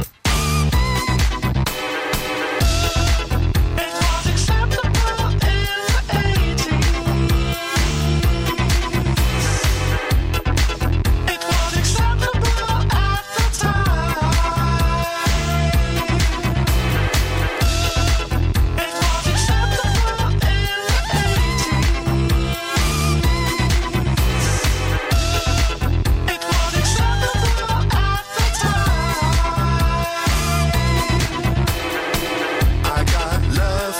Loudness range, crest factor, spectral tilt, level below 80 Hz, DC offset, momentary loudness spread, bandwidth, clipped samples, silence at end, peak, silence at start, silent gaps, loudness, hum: 1 LU; 10 dB; -4.5 dB/octave; -22 dBFS; under 0.1%; 2 LU; 16.5 kHz; under 0.1%; 0 s; -6 dBFS; 0 s; none; -19 LUFS; none